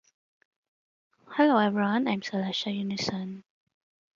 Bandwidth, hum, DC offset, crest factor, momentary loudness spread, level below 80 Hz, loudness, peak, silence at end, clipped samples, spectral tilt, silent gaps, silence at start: 7.6 kHz; none; under 0.1%; 20 dB; 14 LU; -72 dBFS; -27 LUFS; -8 dBFS; 0.75 s; under 0.1%; -5.5 dB/octave; none; 1.3 s